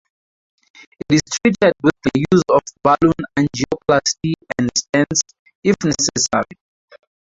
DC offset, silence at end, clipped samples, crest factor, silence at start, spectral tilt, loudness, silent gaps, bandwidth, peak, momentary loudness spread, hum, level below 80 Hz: under 0.1%; 0.95 s; under 0.1%; 18 dB; 1.1 s; -4 dB/octave; -17 LUFS; 5.39-5.46 s, 5.55-5.63 s; 8 kHz; -2 dBFS; 7 LU; none; -48 dBFS